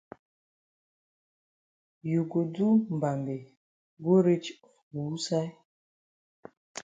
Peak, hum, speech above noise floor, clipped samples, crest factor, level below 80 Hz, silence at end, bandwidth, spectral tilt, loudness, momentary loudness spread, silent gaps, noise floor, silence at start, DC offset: -12 dBFS; none; over 63 dB; under 0.1%; 20 dB; -76 dBFS; 0 s; 9.2 kHz; -7 dB/octave; -28 LUFS; 17 LU; 3.57-3.97 s, 4.82-4.91 s, 5.65-6.43 s, 6.57-6.75 s; under -90 dBFS; 2.05 s; under 0.1%